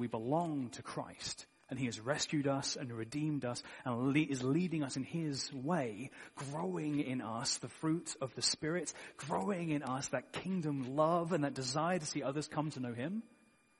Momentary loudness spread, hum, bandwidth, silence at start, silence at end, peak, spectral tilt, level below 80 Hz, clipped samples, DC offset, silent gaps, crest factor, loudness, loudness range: 9 LU; none; 11.5 kHz; 0 s; 0.55 s; -18 dBFS; -4.5 dB/octave; -74 dBFS; under 0.1%; under 0.1%; none; 20 dB; -38 LUFS; 2 LU